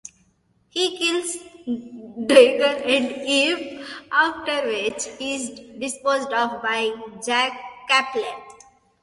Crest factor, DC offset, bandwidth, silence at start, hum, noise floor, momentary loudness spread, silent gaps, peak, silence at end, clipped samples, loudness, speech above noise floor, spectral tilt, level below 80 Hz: 22 dB; under 0.1%; 11.5 kHz; 0.75 s; none; -63 dBFS; 15 LU; none; 0 dBFS; 0.5 s; under 0.1%; -21 LUFS; 42 dB; -1.5 dB/octave; -66 dBFS